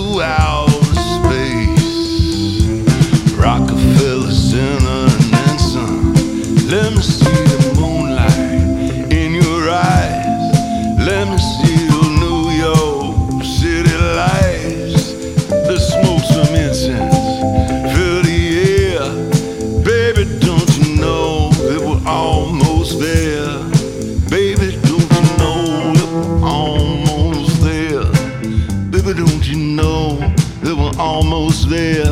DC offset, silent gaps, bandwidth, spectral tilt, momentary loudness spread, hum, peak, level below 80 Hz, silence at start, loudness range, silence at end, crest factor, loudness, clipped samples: under 0.1%; none; 15.5 kHz; -6 dB/octave; 5 LU; none; 0 dBFS; -22 dBFS; 0 s; 2 LU; 0 s; 12 dB; -14 LUFS; under 0.1%